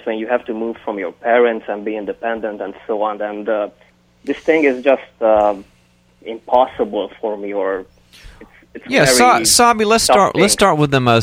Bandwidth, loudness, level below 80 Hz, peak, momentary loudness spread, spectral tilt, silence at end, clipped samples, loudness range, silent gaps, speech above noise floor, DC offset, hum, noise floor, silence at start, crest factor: 16.5 kHz; -15 LUFS; -46 dBFS; 0 dBFS; 15 LU; -3.5 dB/octave; 0 s; under 0.1%; 8 LU; none; 36 dB; under 0.1%; 60 Hz at -55 dBFS; -52 dBFS; 0.05 s; 16 dB